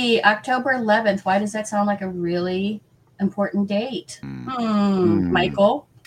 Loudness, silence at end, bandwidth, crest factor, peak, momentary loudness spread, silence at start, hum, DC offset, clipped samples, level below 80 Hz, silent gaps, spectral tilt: -21 LUFS; 0.25 s; 11.5 kHz; 18 dB; -2 dBFS; 11 LU; 0 s; none; under 0.1%; under 0.1%; -56 dBFS; none; -5.5 dB/octave